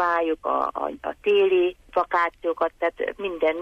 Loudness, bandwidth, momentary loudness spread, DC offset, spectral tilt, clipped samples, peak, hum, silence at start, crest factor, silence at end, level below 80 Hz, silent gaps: -24 LUFS; 6.8 kHz; 8 LU; under 0.1%; -5.5 dB/octave; under 0.1%; -10 dBFS; none; 0 s; 12 dB; 0 s; -56 dBFS; none